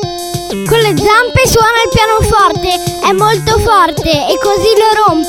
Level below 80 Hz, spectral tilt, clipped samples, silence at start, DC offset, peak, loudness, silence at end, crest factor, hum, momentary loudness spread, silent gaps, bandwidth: -26 dBFS; -4 dB/octave; under 0.1%; 0 s; 0.2%; 0 dBFS; -9 LUFS; 0 s; 10 dB; none; 6 LU; none; 18.5 kHz